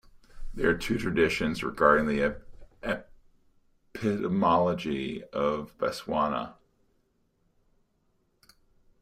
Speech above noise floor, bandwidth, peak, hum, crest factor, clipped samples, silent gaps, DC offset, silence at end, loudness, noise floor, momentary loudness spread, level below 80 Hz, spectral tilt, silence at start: 44 dB; 15.5 kHz; -8 dBFS; none; 22 dB; under 0.1%; none; under 0.1%; 2.5 s; -28 LUFS; -71 dBFS; 12 LU; -48 dBFS; -6 dB/octave; 0.35 s